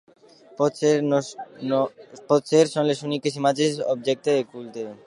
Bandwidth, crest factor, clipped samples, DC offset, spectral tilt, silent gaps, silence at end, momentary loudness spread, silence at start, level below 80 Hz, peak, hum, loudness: 11.5 kHz; 18 dB; under 0.1%; under 0.1%; -5 dB/octave; none; 0.1 s; 13 LU; 0.6 s; -76 dBFS; -4 dBFS; none; -23 LUFS